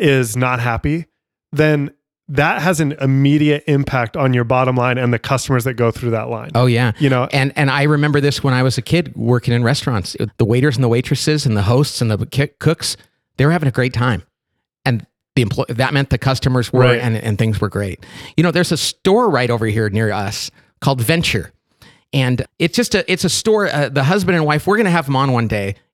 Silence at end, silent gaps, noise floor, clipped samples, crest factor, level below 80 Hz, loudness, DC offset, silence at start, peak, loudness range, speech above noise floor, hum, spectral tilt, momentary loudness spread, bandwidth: 0.2 s; none; -76 dBFS; under 0.1%; 14 dB; -42 dBFS; -16 LUFS; under 0.1%; 0 s; -2 dBFS; 3 LU; 60 dB; none; -5.5 dB/octave; 7 LU; 15.5 kHz